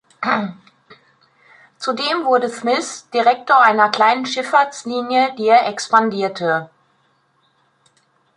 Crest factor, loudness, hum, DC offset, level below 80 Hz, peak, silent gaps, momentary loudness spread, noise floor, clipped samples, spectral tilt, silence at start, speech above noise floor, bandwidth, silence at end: 18 dB; -17 LUFS; none; under 0.1%; -72 dBFS; 0 dBFS; none; 9 LU; -61 dBFS; under 0.1%; -3.5 dB/octave; 0.2 s; 45 dB; 11 kHz; 1.7 s